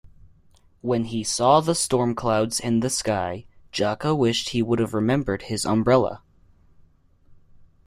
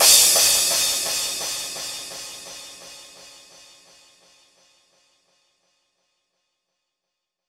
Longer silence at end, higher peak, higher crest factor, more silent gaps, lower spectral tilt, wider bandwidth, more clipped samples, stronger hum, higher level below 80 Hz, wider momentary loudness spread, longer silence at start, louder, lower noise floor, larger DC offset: second, 0.2 s vs 4.25 s; second, -4 dBFS vs 0 dBFS; about the same, 20 dB vs 24 dB; neither; first, -4.5 dB/octave vs 2 dB/octave; about the same, 15.5 kHz vs 17 kHz; neither; neither; first, -50 dBFS vs -60 dBFS; second, 9 LU vs 26 LU; first, 0.85 s vs 0 s; second, -23 LUFS vs -17 LUFS; second, -56 dBFS vs -82 dBFS; neither